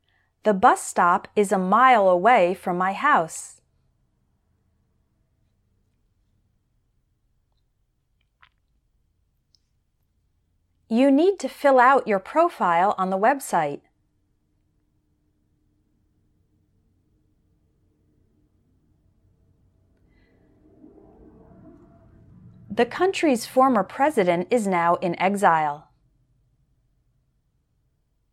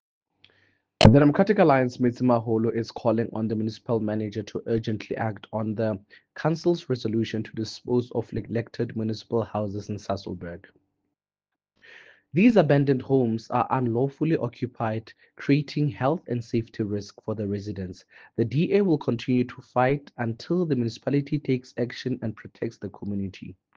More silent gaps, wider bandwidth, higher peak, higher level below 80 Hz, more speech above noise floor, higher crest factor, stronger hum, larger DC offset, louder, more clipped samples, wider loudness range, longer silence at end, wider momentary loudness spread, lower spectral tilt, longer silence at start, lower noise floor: neither; first, 14.5 kHz vs 8.8 kHz; about the same, -4 dBFS vs -2 dBFS; second, -66 dBFS vs -52 dBFS; second, 50 dB vs 63 dB; about the same, 22 dB vs 24 dB; neither; neither; first, -20 LUFS vs -25 LUFS; neither; about the same, 9 LU vs 8 LU; first, 2.55 s vs 0.25 s; second, 9 LU vs 14 LU; second, -5 dB/octave vs -7.5 dB/octave; second, 0.45 s vs 1 s; second, -70 dBFS vs -89 dBFS